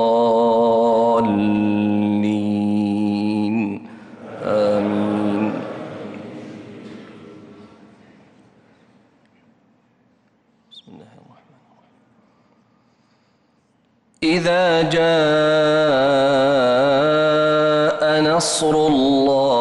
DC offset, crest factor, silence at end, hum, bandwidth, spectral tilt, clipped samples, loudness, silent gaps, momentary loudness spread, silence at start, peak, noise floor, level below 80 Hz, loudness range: under 0.1%; 10 dB; 0 s; none; 11.5 kHz; -5 dB/octave; under 0.1%; -17 LUFS; none; 18 LU; 0 s; -8 dBFS; -61 dBFS; -56 dBFS; 13 LU